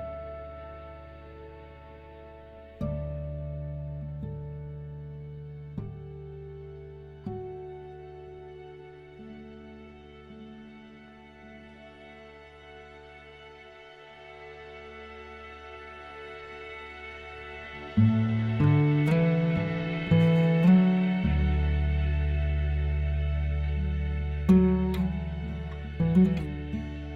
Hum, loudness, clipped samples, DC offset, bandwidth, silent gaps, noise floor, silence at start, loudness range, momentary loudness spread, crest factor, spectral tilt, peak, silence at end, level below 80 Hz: none; -27 LUFS; under 0.1%; under 0.1%; 5.4 kHz; none; -50 dBFS; 0 s; 23 LU; 25 LU; 20 dB; -9.5 dB/octave; -10 dBFS; 0 s; -36 dBFS